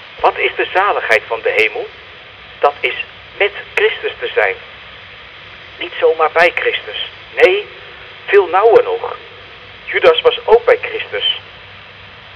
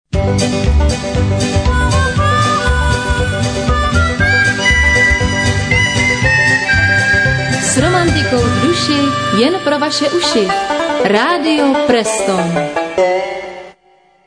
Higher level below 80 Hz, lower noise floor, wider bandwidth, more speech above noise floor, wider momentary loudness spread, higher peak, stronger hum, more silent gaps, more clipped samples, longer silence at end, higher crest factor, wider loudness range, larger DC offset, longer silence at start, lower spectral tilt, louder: second, -50 dBFS vs -22 dBFS; second, -37 dBFS vs -50 dBFS; second, 5.4 kHz vs 10 kHz; second, 23 dB vs 37 dB; first, 23 LU vs 5 LU; about the same, 0 dBFS vs 0 dBFS; neither; neither; neither; second, 0.05 s vs 0.55 s; about the same, 16 dB vs 12 dB; about the same, 5 LU vs 3 LU; neither; second, 0 s vs 0.15 s; about the same, -4.5 dB/octave vs -4.5 dB/octave; about the same, -14 LUFS vs -12 LUFS